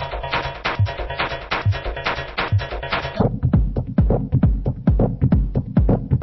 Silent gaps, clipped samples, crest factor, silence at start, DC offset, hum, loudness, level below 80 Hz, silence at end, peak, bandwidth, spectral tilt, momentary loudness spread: none; under 0.1%; 16 dB; 0 s; under 0.1%; none; -21 LUFS; -26 dBFS; 0 s; -4 dBFS; 6 kHz; -8.5 dB/octave; 6 LU